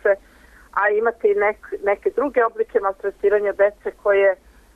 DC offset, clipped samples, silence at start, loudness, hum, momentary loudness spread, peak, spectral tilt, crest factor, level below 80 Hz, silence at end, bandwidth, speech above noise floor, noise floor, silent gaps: under 0.1%; under 0.1%; 0.05 s; -20 LUFS; none; 7 LU; -6 dBFS; -6 dB/octave; 14 dB; -54 dBFS; 0.4 s; 3.9 kHz; 29 dB; -49 dBFS; none